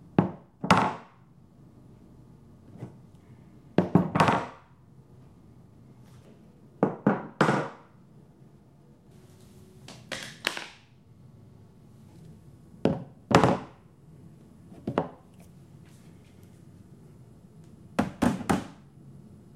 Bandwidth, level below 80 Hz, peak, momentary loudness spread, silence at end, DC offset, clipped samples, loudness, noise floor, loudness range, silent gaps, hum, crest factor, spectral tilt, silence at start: 15 kHz; -58 dBFS; 0 dBFS; 28 LU; 0.35 s; under 0.1%; under 0.1%; -28 LUFS; -56 dBFS; 10 LU; none; none; 30 dB; -6 dB/octave; 0.2 s